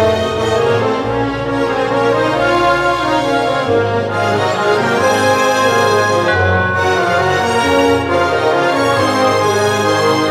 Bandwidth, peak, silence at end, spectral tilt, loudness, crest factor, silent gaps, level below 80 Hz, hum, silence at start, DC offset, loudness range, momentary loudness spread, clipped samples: 15.5 kHz; 0 dBFS; 0 s; -4.5 dB/octave; -13 LUFS; 12 dB; none; -42 dBFS; none; 0 s; under 0.1%; 2 LU; 4 LU; under 0.1%